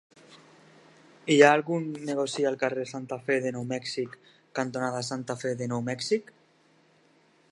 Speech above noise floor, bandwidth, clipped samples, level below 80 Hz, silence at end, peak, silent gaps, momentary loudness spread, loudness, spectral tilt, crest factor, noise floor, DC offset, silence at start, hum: 36 dB; 11.5 kHz; under 0.1%; -76 dBFS; 1.3 s; -4 dBFS; none; 15 LU; -28 LUFS; -4.5 dB/octave; 26 dB; -63 dBFS; under 0.1%; 0.3 s; none